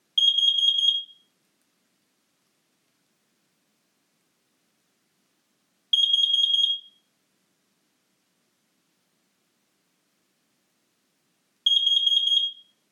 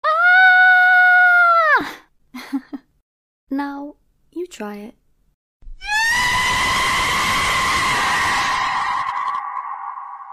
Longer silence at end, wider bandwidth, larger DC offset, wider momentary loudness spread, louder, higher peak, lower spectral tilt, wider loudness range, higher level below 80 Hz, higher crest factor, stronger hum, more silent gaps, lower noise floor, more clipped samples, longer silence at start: first, 0.4 s vs 0 s; about the same, 14 kHz vs 14.5 kHz; neither; second, 9 LU vs 21 LU; second, -20 LUFS vs -15 LUFS; second, -10 dBFS vs -4 dBFS; second, 4 dB/octave vs -1.5 dB/octave; second, 6 LU vs 17 LU; second, under -90 dBFS vs -44 dBFS; about the same, 18 dB vs 14 dB; neither; second, none vs 3.02-3.47 s, 5.34-5.60 s; first, -72 dBFS vs -39 dBFS; neither; about the same, 0.15 s vs 0.05 s